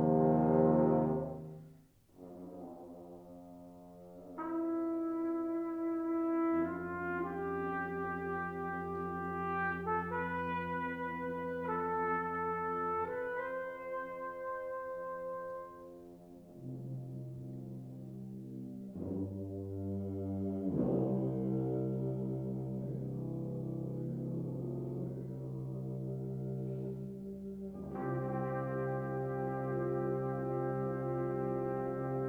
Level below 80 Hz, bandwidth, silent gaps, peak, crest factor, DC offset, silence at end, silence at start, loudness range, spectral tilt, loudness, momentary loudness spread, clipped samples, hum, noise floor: -66 dBFS; 4.7 kHz; none; -16 dBFS; 20 dB; under 0.1%; 0 s; 0 s; 8 LU; -10 dB/octave; -37 LUFS; 14 LU; under 0.1%; none; -62 dBFS